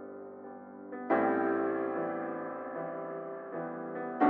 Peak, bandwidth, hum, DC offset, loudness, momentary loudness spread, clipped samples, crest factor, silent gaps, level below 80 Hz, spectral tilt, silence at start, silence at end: -14 dBFS; 4.3 kHz; none; under 0.1%; -34 LUFS; 17 LU; under 0.1%; 20 dB; none; -88 dBFS; -6 dB/octave; 0 s; 0 s